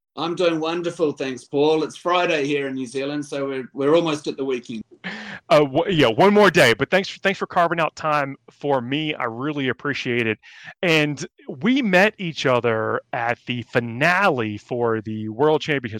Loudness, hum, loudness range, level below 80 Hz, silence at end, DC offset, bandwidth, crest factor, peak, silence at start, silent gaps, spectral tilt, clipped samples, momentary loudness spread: -21 LUFS; none; 5 LU; -58 dBFS; 0 s; under 0.1%; 16.5 kHz; 18 dB; -2 dBFS; 0.15 s; none; -5.5 dB/octave; under 0.1%; 12 LU